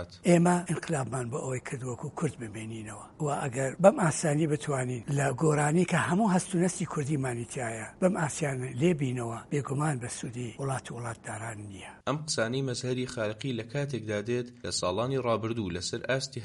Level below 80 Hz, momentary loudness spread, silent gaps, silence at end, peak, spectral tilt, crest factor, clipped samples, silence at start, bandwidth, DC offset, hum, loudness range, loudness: -62 dBFS; 12 LU; none; 0 s; -6 dBFS; -5.5 dB/octave; 24 dB; under 0.1%; 0 s; 11.5 kHz; under 0.1%; none; 6 LU; -30 LUFS